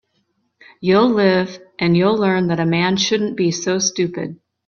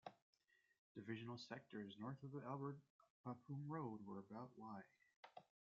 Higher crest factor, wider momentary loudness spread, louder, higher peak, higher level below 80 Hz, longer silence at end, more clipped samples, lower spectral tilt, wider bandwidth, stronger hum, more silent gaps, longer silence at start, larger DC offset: about the same, 16 dB vs 20 dB; second, 9 LU vs 13 LU; first, -17 LUFS vs -54 LUFS; first, -2 dBFS vs -36 dBFS; first, -56 dBFS vs under -90 dBFS; about the same, 0.35 s vs 0.35 s; neither; about the same, -5 dB/octave vs -6 dB/octave; about the same, 7.2 kHz vs 7.4 kHz; neither; second, none vs 0.22-0.33 s, 0.79-0.95 s, 2.90-2.99 s, 3.10-3.24 s, 5.16-5.23 s; first, 0.8 s vs 0.05 s; neither